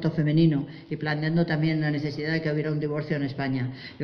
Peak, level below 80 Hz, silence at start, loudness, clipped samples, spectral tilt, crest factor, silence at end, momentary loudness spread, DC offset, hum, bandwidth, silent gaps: -10 dBFS; -54 dBFS; 0 s; -26 LUFS; under 0.1%; -9 dB/octave; 14 dB; 0 s; 8 LU; under 0.1%; none; 6.2 kHz; none